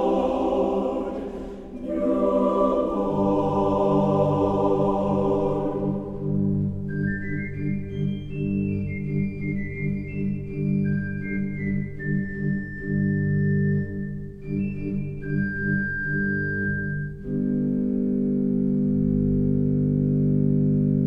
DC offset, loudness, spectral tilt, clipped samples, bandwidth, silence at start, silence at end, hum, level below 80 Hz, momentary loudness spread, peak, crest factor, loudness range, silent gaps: under 0.1%; -25 LUFS; -10 dB/octave; under 0.1%; 5.6 kHz; 0 s; 0 s; none; -42 dBFS; 8 LU; -8 dBFS; 14 dB; 5 LU; none